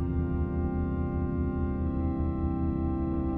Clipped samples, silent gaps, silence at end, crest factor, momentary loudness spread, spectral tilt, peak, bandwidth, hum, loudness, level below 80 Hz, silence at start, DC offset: under 0.1%; none; 0 s; 12 dB; 1 LU; -12.5 dB/octave; -18 dBFS; 3.5 kHz; none; -30 LUFS; -34 dBFS; 0 s; 0.1%